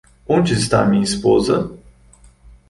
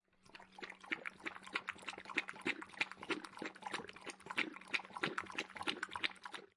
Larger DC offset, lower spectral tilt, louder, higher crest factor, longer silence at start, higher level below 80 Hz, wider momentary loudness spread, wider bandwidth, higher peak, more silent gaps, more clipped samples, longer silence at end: neither; first, -5.5 dB/octave vs -2.5 dB/octave; first, -16 LUFS vs -43 LUFS; second, 18 dB vs 28 dB; about the same, 0.3 s vs 0.25 s; first, -42 dBFS vs -82 dBFS; second, 5 LU vs 11 LU; about the same, 11.5 kHz vs 11.5 kHz; first, 0 dBFS vs -18 dBFS; neither; neither; first, 0.95 s vs 0.1 s